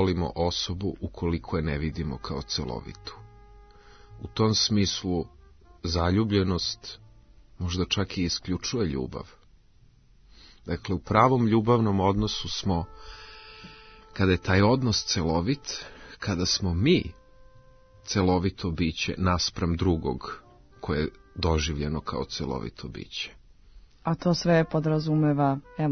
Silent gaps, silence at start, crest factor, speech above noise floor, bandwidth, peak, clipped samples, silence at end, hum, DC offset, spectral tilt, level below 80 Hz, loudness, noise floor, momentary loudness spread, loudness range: none; 0 s; 22 dB; 31 dB; 6.6 kHz; -6 dBFS; under 0.1%; 0 s; none; under 0.1%; -5.5 dB/octave; -46 dBFS; -27 LUFS; -57 dBFS; 18 LU; 6 LU